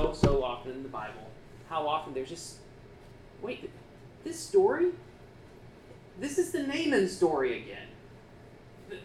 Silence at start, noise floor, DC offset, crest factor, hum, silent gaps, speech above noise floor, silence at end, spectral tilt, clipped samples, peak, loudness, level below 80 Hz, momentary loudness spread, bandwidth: 0 s; -52 dBFS; under 0.1%; 26 dB; none; none; 21 dB; 0 s; -5.5 dB/octave; under 0.1%; -6 dBFS; -31 LUFS; -48 dBFS; 26 LU; 14.5 kHz